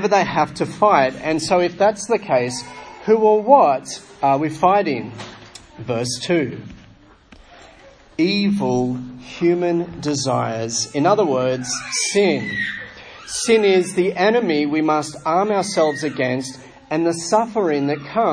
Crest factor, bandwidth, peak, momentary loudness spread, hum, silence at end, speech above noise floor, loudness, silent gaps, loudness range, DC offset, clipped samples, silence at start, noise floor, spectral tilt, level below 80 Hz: 18 dB; 10.5 kHz; 0 dBFS; 12 LU; none; 0 s; 30 dB; -19 LUFS; none; 5 LU; under 0.1%; under 0.1%; 0 s; -48 dBFS; -4.5 dB/octave; -54 dBFS